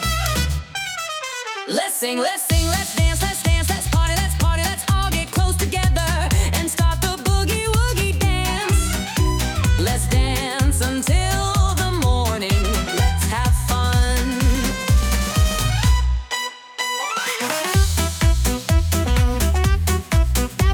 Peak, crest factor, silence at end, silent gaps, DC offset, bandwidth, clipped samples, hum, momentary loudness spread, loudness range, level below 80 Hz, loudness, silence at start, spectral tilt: -4 dBFS; 14 dB; 0 s; none; under 0.1%; 19.5 kHz; under 0.1%; none; 4 LU; 1 LU; -22 dBFS; -20 LUFS; 0 s; -4 dB/octave